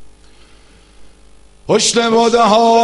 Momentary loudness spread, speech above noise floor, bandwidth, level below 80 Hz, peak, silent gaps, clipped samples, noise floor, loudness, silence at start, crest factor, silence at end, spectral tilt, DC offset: 7 LU; 35 dB; 11.5 kHz; -48 dBFS; 0 dBFS; none; under 0.1%; -45 dBFS; -12 LUFS; 0 s; 14 dB; 0 s; -3 dB/octave; under 0.1%